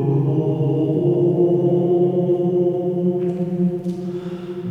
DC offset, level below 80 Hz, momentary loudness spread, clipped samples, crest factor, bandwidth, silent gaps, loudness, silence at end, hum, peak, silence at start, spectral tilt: under 0.1%; -58 dBFS; 10 LU; under 0.1%; 12 dB; 3.9 kHz; none; -19 LUFS; 0 s; none; -6 dBFS; 0 s; -11 dB/octave